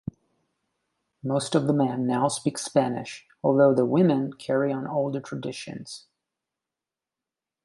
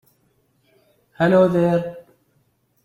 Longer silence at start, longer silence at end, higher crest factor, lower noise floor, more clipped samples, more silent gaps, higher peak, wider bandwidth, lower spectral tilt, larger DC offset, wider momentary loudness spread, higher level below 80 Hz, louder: about the same, 1.25 s vs 1.2 s; first, 1.65 s vs 0.85 s; about the same, 20 dB vs 18 dB; first, -89 dBFS vs -64 dBFS; neither; neither; second, -8 dBFS vs -4 dBFS; first, 11.5 kHz vs 10 kHz; second, -6 dB/octave vs -8.5 dB/octave; neither; first, 17 LU vs 9 LU; second, -68 dBFS vs -58 dBFS; second, -25 LUFS vs -18 LUFS